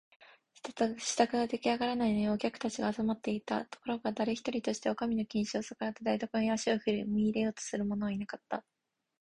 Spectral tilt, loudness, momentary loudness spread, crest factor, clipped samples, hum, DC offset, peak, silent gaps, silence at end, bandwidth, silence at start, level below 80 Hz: -4.5 dB/octave; -34 LUFS; 8 LU; 22 dB; under 0.1%; none; under 0.1%; -12 dBFS; none; 0.6 s; 11 kHz; 0.65 s; -66 dBFS